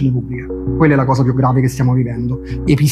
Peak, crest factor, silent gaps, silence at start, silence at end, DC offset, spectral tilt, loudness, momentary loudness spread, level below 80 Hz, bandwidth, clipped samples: 0 dBFS; 14 dB; none; 0 s; 0 s; under 0.1%; -7.5 dB/octave; -15 LUFS; 9 LU; -32 dBFS; 13.5 kHz; under 0.1%